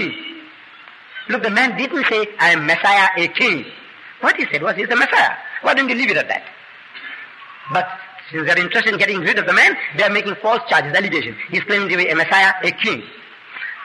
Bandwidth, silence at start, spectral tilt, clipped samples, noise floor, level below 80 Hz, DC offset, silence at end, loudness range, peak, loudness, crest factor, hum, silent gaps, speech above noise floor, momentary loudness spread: 11.5 kHz; 0 s; -3.5 dB/octave; under 0.1%; -41 dBFS; -68 dBFS; under 0.1%; 0 s; 4 LU; -2 dBFS; -16 LUFS; 16 dB; none; none; 25 dB; 20 LU